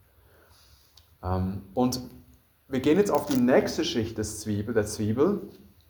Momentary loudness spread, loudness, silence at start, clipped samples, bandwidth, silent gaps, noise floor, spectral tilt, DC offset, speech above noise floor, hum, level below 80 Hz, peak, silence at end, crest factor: 11 LU; -27 LUFS; 1.2 s; under 0.1%; over 20 kHz; none; -58 dBFS; -5.5 dB/octave; under 0.1%; 33 dB; none; -56 dBFS; -8 dBFS; 0.4 s; 20 dB